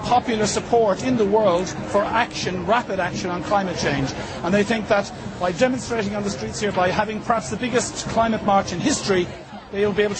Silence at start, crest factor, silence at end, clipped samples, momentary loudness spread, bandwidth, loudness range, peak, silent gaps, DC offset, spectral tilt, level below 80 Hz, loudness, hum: 0 s; 16 dB; 0 s; under 0.1%; 7 LU; 8.8 kHz; 2 LU; -4 dBFS; none; under 0.1%; -4.5 dB/octave; -46 dBFS; -22 LUFS; none